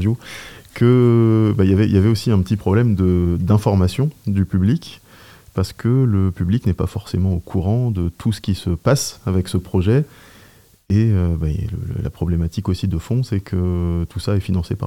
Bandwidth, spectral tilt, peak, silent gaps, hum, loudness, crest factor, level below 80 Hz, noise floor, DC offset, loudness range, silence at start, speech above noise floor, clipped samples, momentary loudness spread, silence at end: 15.5 kHz; -7.5 dB/octave; -2 dBFS; none; none; -19 LUFS; 16 dB; -40 dBFS; -49 dBFS; 0.1%; 5 LU; 0 s; 32 dB; under 0.1%; 9 LU; 0 s